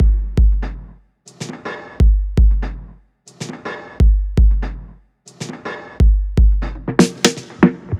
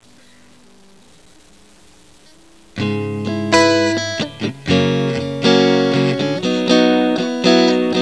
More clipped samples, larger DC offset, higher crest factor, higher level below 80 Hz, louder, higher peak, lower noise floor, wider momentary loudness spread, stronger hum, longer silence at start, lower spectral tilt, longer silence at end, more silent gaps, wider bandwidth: neither; second, under 0.1% vs 0.4%; about the same, 16 dB vs 18 dB; first, -16 dBFS vs -54 dBFS; about the same, -17 LUFS vs -16 LUFS; about the same, 0 dBFS vs 0 dBFS; about the same, -46 dBFS vs -48 dBFS; first, 16 LU vs 10 LU; neither; second, 0 s vs 2.75 s; about the same, -6 dB/octave vs -5 dB/octave; about the same, 0 s vs 0 s; neither; about the same, 11.5 kHz vs 11 kHz